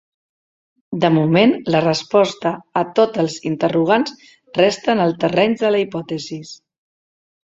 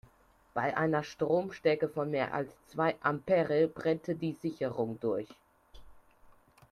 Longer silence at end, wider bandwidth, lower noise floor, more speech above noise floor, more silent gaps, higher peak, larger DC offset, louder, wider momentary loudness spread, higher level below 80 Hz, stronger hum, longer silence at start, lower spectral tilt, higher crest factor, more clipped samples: first, 1.05 s vs 0.4 s; second, 8 kHz vs 12.5 kHz; first, under -90 dBFS vs -65 dBFS; first, over 73 dB vs 33 dB; neither; first, -2 dBFS vs -14 dBFS; neither; first, -17 LUFS vs -32 LUFS; first, 12 LU vs 7 LU; first, -60 dBFS vs -66 dBFS; neither; first, 0.9 s vs 0.55 s; about the same, -6 dB/octave vs -7 dB/octave; about the same, 18 dB vs 18 dB; neither